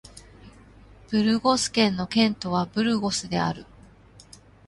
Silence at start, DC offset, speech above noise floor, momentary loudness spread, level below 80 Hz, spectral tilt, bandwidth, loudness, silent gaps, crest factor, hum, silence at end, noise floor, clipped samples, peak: 0.15 s; under 0.1%; 28 dB; 6 LU; -54 dBFS; -4.5 dB/octave; 11.5 kHz; -24 LUFS; none; 20 dB; none; 1.05 s; -51 dBFS; under 0.1%; -6 dBFS